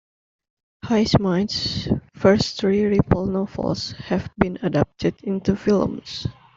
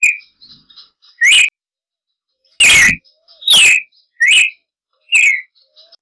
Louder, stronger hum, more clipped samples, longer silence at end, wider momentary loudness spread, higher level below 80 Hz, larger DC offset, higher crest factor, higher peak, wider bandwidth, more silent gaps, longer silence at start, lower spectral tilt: second, -22 LUFS vs -9 LUFS; neither; neither; second, 0.25 s vs 0.6 s; second, 8 LU vs 12 LU; about the same, -44 dBFS vs -46 dBFS; neither; first, 20 dB vs 8 dB; first, -2 dBFS vs -6 dBFS; second, 7.6 kHz vs 11 kHz; neither; first, 0.85 s vs 0 s; first, -6.5 dB/octave vs 1.5 dB/octave